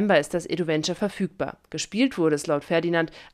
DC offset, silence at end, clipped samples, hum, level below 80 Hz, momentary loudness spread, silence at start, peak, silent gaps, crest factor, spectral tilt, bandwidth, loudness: under 0.1%; 0.05 s; under 0.1%; none; -58 dBFS; 8 LU; 0 s; -8 dBFS; none; 18 dB; -5 dB/octave; 14 kHz; -25 LUFS